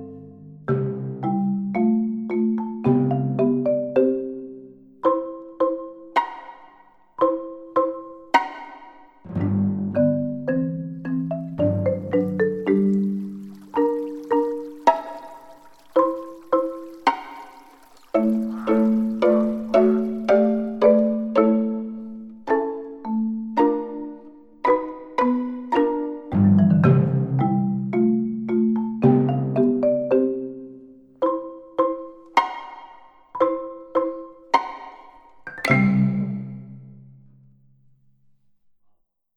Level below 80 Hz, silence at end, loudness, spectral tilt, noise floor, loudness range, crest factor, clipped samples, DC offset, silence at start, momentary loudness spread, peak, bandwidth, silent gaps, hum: -60 dBFS; 2.4 s; -22 LUFS; -9 dB/octave; -63 dBFS; 6 LU; 20 dB; under 0.1%; under 0.1%; 0 s; 17 LU; -2 dBFS; 7.8 kHz; none; none